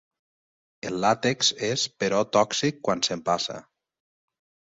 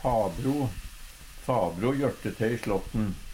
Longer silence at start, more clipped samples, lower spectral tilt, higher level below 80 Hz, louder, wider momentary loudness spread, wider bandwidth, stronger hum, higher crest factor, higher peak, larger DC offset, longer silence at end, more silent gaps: first, 0.85 s vs 0 s; neither; second, -3 dB/octave vs -7 dB/octave; second, -64 dBFS vs -42 dBFS; first, -25 LUFS vs -29 LUFS; second, 10 LU vs 16 LU; second, 8.4 kHz vs 16 kHz; neither; first, 22 dB vs 16 dB; first, -6 dBFS vs -12 dBFS; neither; first, 1.1 s vs 0 s; neither